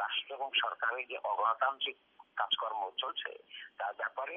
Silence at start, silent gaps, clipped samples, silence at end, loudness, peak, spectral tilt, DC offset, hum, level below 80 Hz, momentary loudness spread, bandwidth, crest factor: 0 s; none; under 0.1%; 0 s; -35 LUFS; -18 dBFS; 5 dB/octave; under 0.1%; none; -90 dBFS; 12 LU; 5.2 kHz; 18 dB